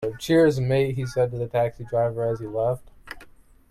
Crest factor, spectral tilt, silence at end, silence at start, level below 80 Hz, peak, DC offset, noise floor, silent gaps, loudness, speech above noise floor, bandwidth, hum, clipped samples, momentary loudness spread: 16 dB; -7 dB/octave; 0.45 s; 0 s; -50 dBFS; -8 dBFS; under 0.1%; -50 dBFS; none; -24 LUFS; 27 dB; 14.5 kHz; none; under 0.1%; 22 LU